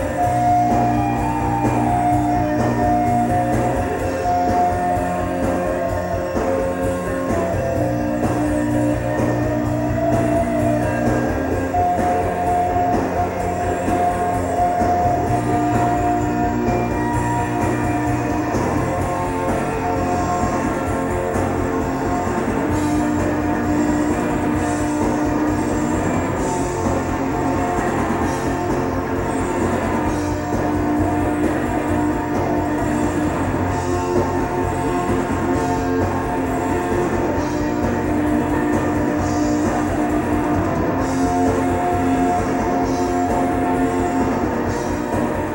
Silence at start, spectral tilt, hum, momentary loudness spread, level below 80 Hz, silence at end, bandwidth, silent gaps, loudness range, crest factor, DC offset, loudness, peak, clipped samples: 0 s; -7 dB/octave; none; 3 LU; -34 dBFS; 0 s; 16.5 kHz; none; 2 LU; 14 dB; under 0.1%; -20 LUFS; -6 dBFS; under 0.1%